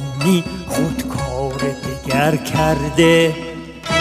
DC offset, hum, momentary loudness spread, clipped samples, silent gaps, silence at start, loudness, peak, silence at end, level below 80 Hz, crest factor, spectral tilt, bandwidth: under 0.1%; none; 11 LU; under 0.1%; none; 0 s; -18 LUFS; 0 dBFS; 0 s; -36 dBFS; 18 dB; -5 dB/octave; 16 kHz